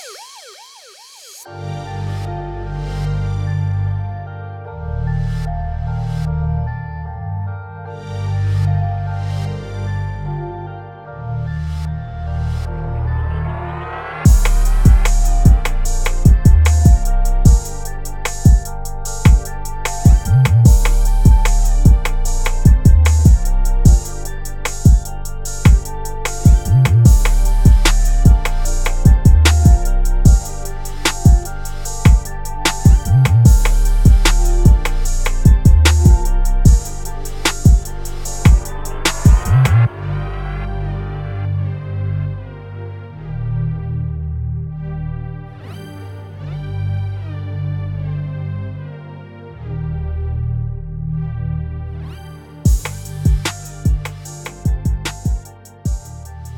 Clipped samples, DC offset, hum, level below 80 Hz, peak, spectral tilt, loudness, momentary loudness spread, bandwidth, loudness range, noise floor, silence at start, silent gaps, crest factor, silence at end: under 0.1%; under 0.1%; none; -16 dBFS; 0 dBFS; -5.5 dB/octave; -16 LUFS; 17 LU; 17.5 kHz; 11 LU; -41 dBFS; 0 s; none; 14 dB; 0 s